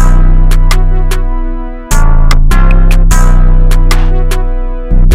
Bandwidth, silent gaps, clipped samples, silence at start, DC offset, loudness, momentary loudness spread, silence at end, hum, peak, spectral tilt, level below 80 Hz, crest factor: 12.5 kHz; none; under 0.1%; 0 s; under 0.1%; -12 LUFS; 8 LU; 0 s; none; 0 dBFS; -5.5 dB/octave; -4 dBFS; 4 dB